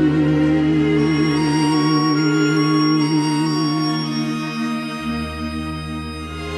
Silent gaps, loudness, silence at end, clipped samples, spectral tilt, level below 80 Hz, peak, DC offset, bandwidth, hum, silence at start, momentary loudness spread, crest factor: none; -19 LUFS; 0 s; under 0.1%; -6 dB/octave; -42 dBFS; -6 dBFS; under 0.1%; 12 kHz; none; 0 s; 10 LU; 12 dB